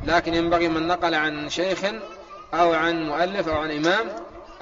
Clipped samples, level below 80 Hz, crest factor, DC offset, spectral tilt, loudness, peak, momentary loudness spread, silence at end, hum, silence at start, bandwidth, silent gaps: under 0.1%; -46 dBFS; 18 dB; under 0.1%; -2.5 dB/octave; -23 LUFS; -6 dBFS; 14 LU; 0 s; none; 0 s; 7.6 kHz; none